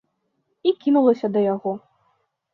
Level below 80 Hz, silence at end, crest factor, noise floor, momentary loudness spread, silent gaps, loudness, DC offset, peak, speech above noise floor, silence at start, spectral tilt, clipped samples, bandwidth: -72 dBFS; 0.75 s; 16 dB; -72 dBFS; 11 LU; none; -21 LUFS; under 0.1%; -6 dBFS; 53 dB; 0.65 s; -9 dB/octave; under 0.1%; 6 kHz